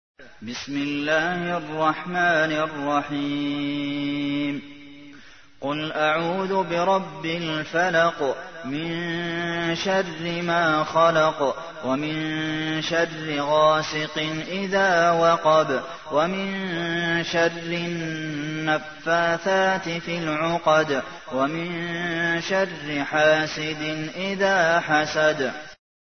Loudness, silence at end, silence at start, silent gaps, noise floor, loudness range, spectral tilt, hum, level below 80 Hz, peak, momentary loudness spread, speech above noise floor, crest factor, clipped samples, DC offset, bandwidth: -23 LUFS; 0.4 s; 0.2 s; none; -49 dBFS; 4 LU; -5 dB/octave; none; -60 dBFS; -6 dBFS; 9 LU; 26 dB; 18 dB; under 0.1%; 0.3%; 6.6 kHz